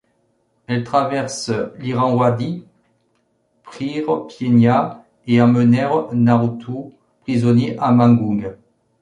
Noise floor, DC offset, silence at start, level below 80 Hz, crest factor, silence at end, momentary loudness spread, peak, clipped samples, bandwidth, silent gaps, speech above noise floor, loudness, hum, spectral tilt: -64 dBFS; under 0.1%; 0.7 s; -54 dBFS; 16 dB; 0.45 s; 15 LU; -2 dBFS; under 0.1%; 11 kHz; none; 48 dB; -17 LUFS; none; -7.5 dB/octave